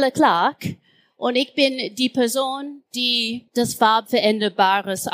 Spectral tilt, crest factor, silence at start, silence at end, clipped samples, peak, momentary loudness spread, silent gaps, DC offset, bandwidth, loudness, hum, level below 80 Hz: -3.5 dB/octave; 18 dB; 0 s; 0 s; under 0.1%; -2 dBFS; 9 LU; none; under 0.1%; 15.5 kHz; -20 LUFS; none; -64 dBFS